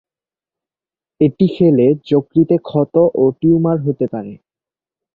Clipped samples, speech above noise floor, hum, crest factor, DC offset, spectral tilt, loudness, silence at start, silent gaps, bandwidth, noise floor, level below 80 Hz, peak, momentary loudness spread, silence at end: under 0.1%; over 76 dB; none; 14 dB; under 0.1%; -11.5 dB/octave; -15 LUFS; 1.2 s; none; 4.7 kHz; under -90 dBFS; -54 dBFS; -2 dBFS; 8 LU; 0.8 s